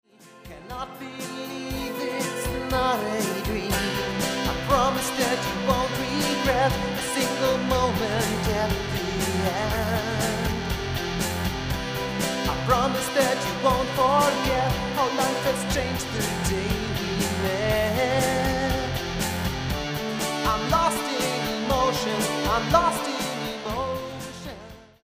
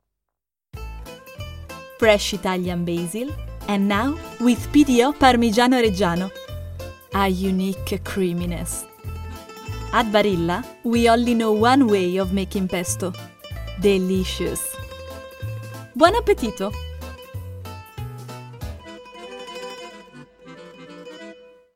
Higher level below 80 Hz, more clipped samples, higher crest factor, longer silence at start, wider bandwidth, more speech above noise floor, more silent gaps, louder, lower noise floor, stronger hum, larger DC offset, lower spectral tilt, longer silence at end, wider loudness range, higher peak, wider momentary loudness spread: about the same, -38 dBFS vs -38 dBFS; neither; about the same, 20 dB vs 22 dB; second, 0.2 s vs 0.75 s; about the same, 16 kHz vs 16.5 kHz; second, 17 dB vs 65 dB; neither; second, -25 LUFS vs -20 LUFS; second, -46 dBFS vs -85 dBFS; neither; neither; about the same, -4 dB/octave vs -5 dB/octave; about the same, 0.2 s vs 0.3 s; second, 3 LU vs 17 LU; second, -6 dBFS vs 0 dBFS; second, 7 LU vs 21 LU